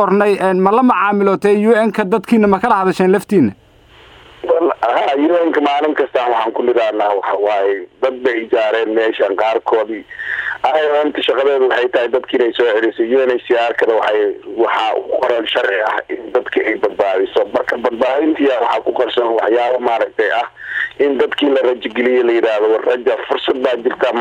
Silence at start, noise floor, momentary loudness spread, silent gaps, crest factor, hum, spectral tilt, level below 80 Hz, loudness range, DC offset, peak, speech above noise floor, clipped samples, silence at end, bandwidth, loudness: 0 s; -44 dBFS; 5 LU; none; 14 dB; none; -6 dB/octave; -56 dBFS; 2 LU; under 0.1%; 0 dBFS; 29 dB; under 0.1%; 0 s; 11.5 kHz; -15 LUFS